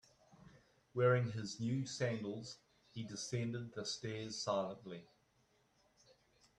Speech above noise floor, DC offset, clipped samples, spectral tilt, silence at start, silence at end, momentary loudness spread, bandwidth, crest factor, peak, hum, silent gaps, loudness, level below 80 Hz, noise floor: 36 dB; under 0.1%; under 0.1%; -5 dB/octave; 0.4 s; 1.55 s; 18 LU; 10.5 kHz; 22 dB; -20 dBFS; none; none; -40 LUFS; -76 dBFS; -76 dBFS